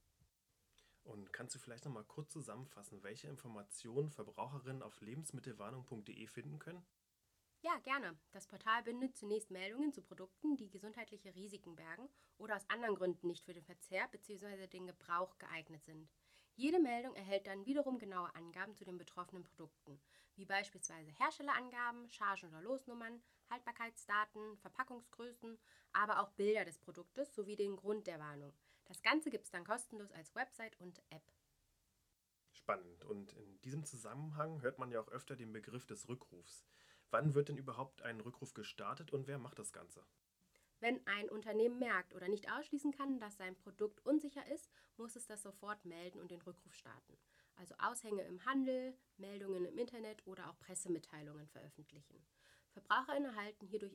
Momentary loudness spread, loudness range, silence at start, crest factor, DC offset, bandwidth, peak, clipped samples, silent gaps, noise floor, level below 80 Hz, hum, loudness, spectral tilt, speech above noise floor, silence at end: 19 LU; 8 LU; 1.05 s; 28 dB; under 0.1%; 16 kHz; -18 dBFS; under 0.1%; none; -84 dBFS; -84 dBFS; none; -44 LUFS; -4.5 dB/octave; 39 dB; 0 s